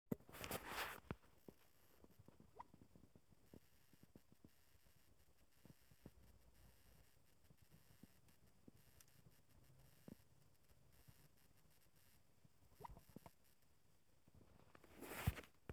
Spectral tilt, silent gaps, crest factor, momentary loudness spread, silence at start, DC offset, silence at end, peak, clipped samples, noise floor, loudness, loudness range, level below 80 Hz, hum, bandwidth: -4.5 dB/octave; none; 32 dB; 21 LU; 0.1 s; under 0.1%; 0 s; -28 dBFS; under 0.1%; -79 dBFS; -52 LUFS; 14 LU; -70 dBFS; none; over 20 kHz